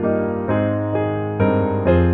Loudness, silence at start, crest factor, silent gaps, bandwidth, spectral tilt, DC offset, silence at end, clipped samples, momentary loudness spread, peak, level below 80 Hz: -19 LUFS; 0 s; 14 dB; none; 4.1 kHz; -11.5 dB/octave; under 0.1%; 0 s; under 0.1%; 4 LU; -4 dBFS; -36 dBFS